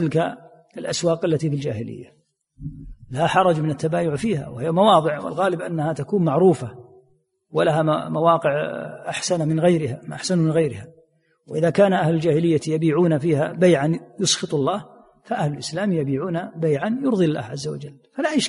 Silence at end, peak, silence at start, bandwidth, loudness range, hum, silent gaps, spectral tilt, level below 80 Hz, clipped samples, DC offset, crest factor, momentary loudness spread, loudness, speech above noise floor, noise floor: 0 s; -4 dBFS; 0 s; 11.5 kHz; 4 LU; none; none; -5.5 dB/octave; -56 dBFS; under 0.1%; under 0.1%; 18 dB; 13 LU; -21 LUFS; 42 dB; -63 dBFS